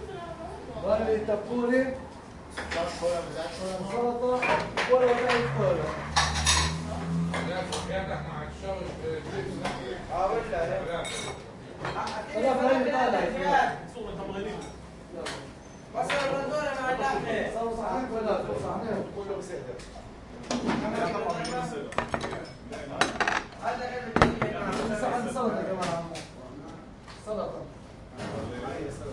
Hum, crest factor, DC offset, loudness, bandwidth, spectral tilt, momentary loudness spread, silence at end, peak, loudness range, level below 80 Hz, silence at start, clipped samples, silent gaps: none; 28 dB; under 0.1%; -29 LUFS; 11.5 kHz; -4.5 dB/octave; 16 LU; 0 s; -2 dBFS; 7 LU; -48 dBFS; 0 s; under 0.1%; none